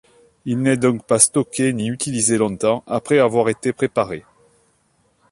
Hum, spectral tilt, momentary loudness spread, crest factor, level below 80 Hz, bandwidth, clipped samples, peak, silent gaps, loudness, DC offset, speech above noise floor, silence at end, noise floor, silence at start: none; -4.5 dB/octave; 8 LU; 20 dB; -56 dBFS; 11.5 kHz; under 0.1%; 0 dBFS; none; -18 LUFS; under 0.1%; 44 dB; 1.1 s; -62 dBFS; 0.45 s